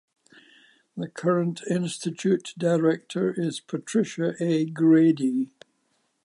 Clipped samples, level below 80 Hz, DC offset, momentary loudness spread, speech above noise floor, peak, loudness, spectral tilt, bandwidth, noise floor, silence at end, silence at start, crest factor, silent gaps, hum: under 0.1%; -78 dBFS; under 0.1%; 11 LU; 47 dB; -10 dBFS; -25 LUFS; -6.5 dB/octave; 11 kHz; -71 dBFS; 0.8 s; 0.95 s; 16 dB; none; none